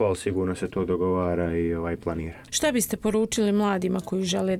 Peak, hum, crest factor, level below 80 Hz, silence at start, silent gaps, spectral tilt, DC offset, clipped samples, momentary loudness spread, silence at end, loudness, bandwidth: -10 dBFS; none; 14 dB; -46 dBFS; 0 s; none; -5 dB/octave; under 0.1%; under 0.1%; 6 LU; 0 s; -26 LUFS; 16 kHz